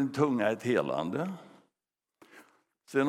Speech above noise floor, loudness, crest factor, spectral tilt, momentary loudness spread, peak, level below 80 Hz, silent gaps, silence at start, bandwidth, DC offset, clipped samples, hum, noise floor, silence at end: 60 dB; -30 LUFS; 20 dB; -6.5 dB/octave; 10 LU; -12 dBFS; -78 dBFS; none; 0 s; 15 kHz; under 0.1%; under 0.1%; none; -90 dBFS; 0 s